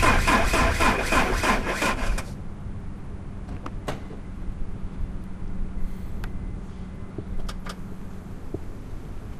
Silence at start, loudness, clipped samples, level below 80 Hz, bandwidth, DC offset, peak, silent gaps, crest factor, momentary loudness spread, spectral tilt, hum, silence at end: 0 s; -27 LUFS; under 0.1%; -30 dBFS; 15.5 kHz; under 0.1%; -4 dBFS; none; 22 dB; 18 LU; -4.5 dB/octave; none; 0 s